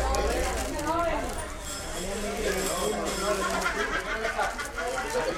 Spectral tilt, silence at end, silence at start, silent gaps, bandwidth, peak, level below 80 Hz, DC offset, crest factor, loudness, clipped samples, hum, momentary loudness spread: -3 dB/octave; 0 s; 0 s; none; 16.5 kHz; -10 dBFS; -38 dBFS; under 0.1%; 20 dB; -29 LUFS; under 0.1%; none; 6 LU